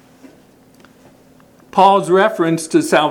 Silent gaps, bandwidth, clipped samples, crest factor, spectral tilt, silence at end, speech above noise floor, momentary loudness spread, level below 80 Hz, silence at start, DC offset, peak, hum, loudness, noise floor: none; 18 kHz; under 0.1%; 16 dB; -5 dB/octave; 0 s; 35 dB; 6 LU; -62 dBFS; 1.75 s; under 0.1%; 0 dBFS; none; -14 LUFS; -47 dBFS